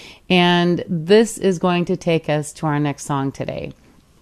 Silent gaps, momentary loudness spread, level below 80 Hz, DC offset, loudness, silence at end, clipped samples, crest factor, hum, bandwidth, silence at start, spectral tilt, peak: none; 11 LU; -52 dBFS; under 0.1%; -18 LUFS; 0.5 s; under 0.1%; 18 dB; none; 13.5 kHz; 0 s; -5.5 dB/octave; -2 dBFS